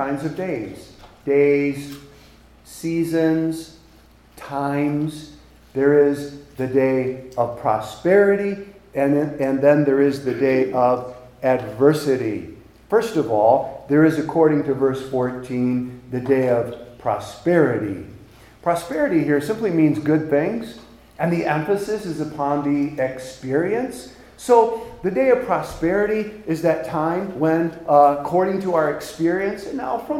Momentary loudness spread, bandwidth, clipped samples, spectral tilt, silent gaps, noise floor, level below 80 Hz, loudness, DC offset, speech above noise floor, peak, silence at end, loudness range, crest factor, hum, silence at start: 13 LU; 15.5 kHz; under 0.1%; -7 dB/octave; none; -50 dBFS; -52 dBFS; -20 LUFS; under 0.1%; 30 dB; -2 dBFS; 0 s; 4 LU; 18 dB; none; 0 s